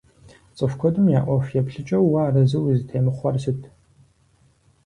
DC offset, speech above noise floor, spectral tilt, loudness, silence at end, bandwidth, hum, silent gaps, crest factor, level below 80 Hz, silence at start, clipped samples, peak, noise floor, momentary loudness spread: under 0.1%; 39 dB; -9.5 dB/octave; -21 LUFS; 1.2 s; 10 kHz; none; none; 14 dB; -52 dBFS; 0.55 s; under 0.1%; -6 dBFS; -59 dBFS; 8 LU